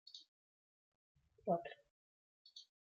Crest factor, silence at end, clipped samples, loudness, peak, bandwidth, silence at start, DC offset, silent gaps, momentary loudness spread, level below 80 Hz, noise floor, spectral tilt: 24 dB; 0.25 s; under 0.1%; -43 LUFS; -26 dBFS; 7.4 kHz; 0.05 s; under 0.1%; 0.28-1.15 s, 1.90-2.45 s; 19 LU; -86 dBFS; under -90 dBFS; -4.5 dB/octave